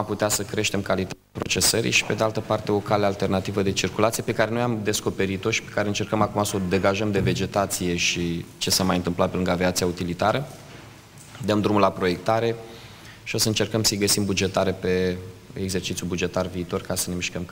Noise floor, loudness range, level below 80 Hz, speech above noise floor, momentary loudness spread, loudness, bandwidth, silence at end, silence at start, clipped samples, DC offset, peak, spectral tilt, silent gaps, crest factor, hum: -45 dBFS; 2 LU; -50 dBFS; 21 dB; 9 LU; -23 LUFS; 16.5 kHz; 0 s; 0 s; under 0.1%; under 0.1%; -2 dBFS; -4 dB/octave; none; 22 dB; none